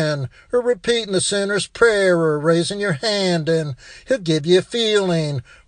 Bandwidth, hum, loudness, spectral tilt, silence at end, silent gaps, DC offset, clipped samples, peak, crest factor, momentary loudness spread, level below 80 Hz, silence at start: 10 kHz; none; -19 LUFS; -4.5 dB/octave; 0.25 s; none; under 0.1%; under 0.1%; 0 dBFS; 18 dB; 6 LU; -52 dBFS; 0 s